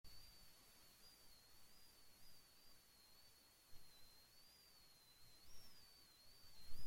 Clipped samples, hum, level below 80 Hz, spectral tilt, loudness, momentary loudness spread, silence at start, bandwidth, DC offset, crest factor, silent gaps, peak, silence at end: under 0.1%; none; -70 dBFS; -2 dB/octave; -67 LUFS; 3 LU; 0.05 s; 16.5 kHz; under 0.1%; 20 dB; none; -34 dBFS; 0 s